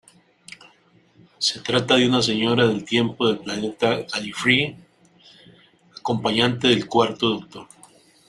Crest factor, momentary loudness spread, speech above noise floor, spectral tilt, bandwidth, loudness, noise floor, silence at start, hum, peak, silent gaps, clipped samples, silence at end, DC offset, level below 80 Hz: 20 dB; 11 LU; 36 dB; -4.5 dB/octave; 12 kHz; -21 LUFS; -57 dBFS; 1.4 s; none; -4 dBFS; none; under 0.1%; 0.65 s; under 0.1%; -60 dBFS